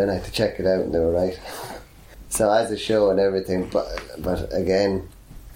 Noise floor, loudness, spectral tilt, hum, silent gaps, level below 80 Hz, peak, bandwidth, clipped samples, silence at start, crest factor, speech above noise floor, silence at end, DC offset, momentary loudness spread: -44 dBFS; -22 LUFS; -5 dB/octave; none; none; -42 dBFS; -6 dBFS; 17 kHz; under 0.1%; 0 s; 16 dB; 22 dB; 0 s; under 0.1%; 14 LU